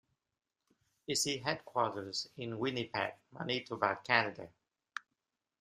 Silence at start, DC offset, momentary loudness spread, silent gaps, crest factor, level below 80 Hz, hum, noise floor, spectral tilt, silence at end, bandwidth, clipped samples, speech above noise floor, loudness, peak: 1.1 s; under 0.1%; 17 LU; none; 28 dB; -76 dBFS; none; -88 dBFS; -3 dB/octave; 0.6 s; 15 kHz; under 0.1%; 51 dB; -35 LUFS; -10 dBFS